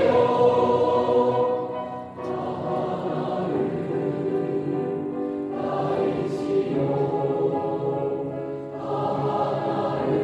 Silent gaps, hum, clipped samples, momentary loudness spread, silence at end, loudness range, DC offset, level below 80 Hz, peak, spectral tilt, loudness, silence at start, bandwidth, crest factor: none; none; under 0.1%; 9 LU; 0 s; 3 LU; under 0.1%; -60 dBFS; -8 dBFS; -8.5 dB/octave; -25 LUFS; 0 s; 8.8 kHz; 16 dB